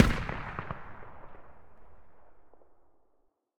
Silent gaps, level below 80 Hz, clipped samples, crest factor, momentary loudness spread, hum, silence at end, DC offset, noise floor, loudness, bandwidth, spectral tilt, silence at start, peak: none; -42 dBFS; under 0.1%; 28 dB; 23 LU; none; 0 s; 0.5%; -71 dBFS; -34 LUFS; 17 kHz; -5.5 dB/octave; 0 s; -6 dBFS